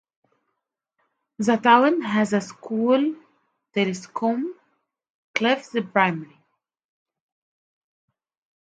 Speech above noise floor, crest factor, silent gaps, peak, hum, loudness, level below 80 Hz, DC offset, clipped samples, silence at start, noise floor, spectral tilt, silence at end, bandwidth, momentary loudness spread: 58 dB; 22 dB; 5.10-5.34 s; -2 dBFS; none; -22 LUFS; -74 dBFS; under 0.1%; under 0.1%; 1.4 s; -80 dBFS; -5.5 dB/octave; 2.45 s; 9.2 kHz; 13 LU